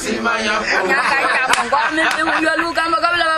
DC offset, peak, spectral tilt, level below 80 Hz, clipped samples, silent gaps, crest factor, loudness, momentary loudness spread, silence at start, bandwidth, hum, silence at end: under 0.1%; 0 dBFS; -2 dB/octave; -48 dBFS; under 0.1%; none; 16 dB; -15 LUFS; 3 LU; 0 s; 16 kHz; none; 0 s